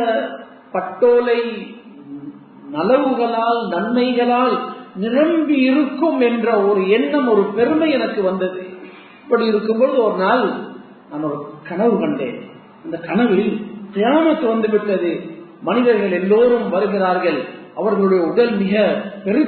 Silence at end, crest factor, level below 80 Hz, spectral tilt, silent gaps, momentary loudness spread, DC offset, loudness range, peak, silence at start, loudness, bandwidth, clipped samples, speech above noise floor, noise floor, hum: 0 s; 14 dB; -64 dBFS; -11.5 dB/octave; none; 14 LU; under 0.1%; 3 LU; -2 dBFS; 0 s; -17 LUFS; 4.5 kHz; under 0.1%; 23 dB; -39 dBFS; none